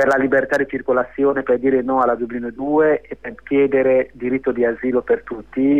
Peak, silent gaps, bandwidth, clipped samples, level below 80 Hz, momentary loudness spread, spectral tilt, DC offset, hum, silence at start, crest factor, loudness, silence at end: -6 dBFS; none; 9 kHz; under 0.1%; -50 dBFS; 7 LU; -7.5 dB/octave; 0.3%; none; 0 s; 12 dB; -18 LUFS; 0 s